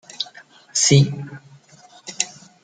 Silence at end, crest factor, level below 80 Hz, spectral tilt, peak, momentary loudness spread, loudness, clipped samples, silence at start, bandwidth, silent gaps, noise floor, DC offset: 0.35 s; 22 dB; -56 dBFS; -4 dB/octave; 0 dBFS; 23 LU; -19 LUFS; under 0.1%; 0.2 s; 9.6 kHz; none; -49 dBFS; under 0.1%